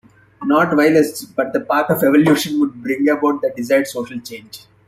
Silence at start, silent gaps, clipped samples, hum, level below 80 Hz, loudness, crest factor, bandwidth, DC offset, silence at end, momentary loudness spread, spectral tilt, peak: 0.4 s; none; under 0.1%; none; -58 dBFS; -16 LUFS; 16 dB; 16 kHz; under 0.1%; 0.3 s; 14 LU; -5.5 dB/octave; -2 dBFS